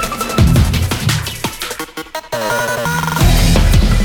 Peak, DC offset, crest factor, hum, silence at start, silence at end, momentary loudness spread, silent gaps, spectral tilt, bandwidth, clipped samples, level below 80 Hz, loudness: 0 dBFS; under 0.1%; 12 dB; none; 0 s; 0 s; 11 LU; none; -5 dB/octave; over 20 kHz; under 0.1%; -18 dBFS; -15 LUFS